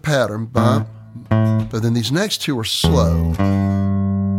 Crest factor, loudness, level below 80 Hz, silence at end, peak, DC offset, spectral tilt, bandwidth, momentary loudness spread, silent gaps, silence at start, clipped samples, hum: 16 dB; -18 LUFS; -32 dBFS; 0 s; -2 dBFS; under 0.1%; -6 dB/octave; 16 kHz; 4 LU; none; 0.05 s; under 0.1%; none